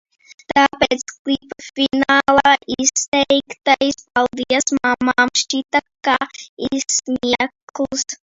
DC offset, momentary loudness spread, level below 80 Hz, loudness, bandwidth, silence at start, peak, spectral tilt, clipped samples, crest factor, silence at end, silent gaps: under 0.1%; 9 LU; -52 dBFS; -17 LUFS; 8 kHz; 0.5 s; 0 dBFS; -1.5 dB/octave; under 0.1%; 18 dB; 0.25 s; 1.19-1.25 s, 3.08-3.12 s, 6.49-6.57 s, 7.62-7.67 s